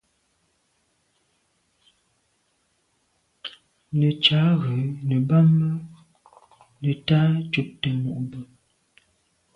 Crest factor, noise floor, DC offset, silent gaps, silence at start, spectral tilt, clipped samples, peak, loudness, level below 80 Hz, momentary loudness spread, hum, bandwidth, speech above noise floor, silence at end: 20 dB; -69 dBFS; under 0.1%; none; 3.45 s; -8 dB/octave; under 0.1%; -4 dBFS; -22 LUFS; -60 dBFS; 21 LU; none; 5.6 kHz; 48 dB; 1.1 s